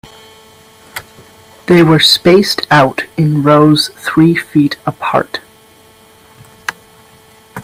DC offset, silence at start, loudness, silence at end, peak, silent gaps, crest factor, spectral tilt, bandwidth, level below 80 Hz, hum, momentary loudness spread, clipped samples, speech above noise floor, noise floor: under 0.1%; 0.95 s; -10 LUFS; 0 s; 0 dBFS; none; 12 dB; -5.5 dB/octave; 16 kHz; -48 dBFS; none; 22 LU; under 0.1%; 33 dB; -43 dBFS